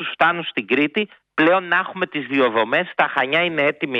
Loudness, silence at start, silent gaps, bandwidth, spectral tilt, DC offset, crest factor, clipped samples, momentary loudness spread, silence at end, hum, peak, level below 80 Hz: -19 LUFS; 0 s; none; 6.8 kHz; -6.5 dB/octave; under 0.1%; 16 dB; under 0.1%; 7 LU; 0 s; none; -2 dBFS; -68 dBFS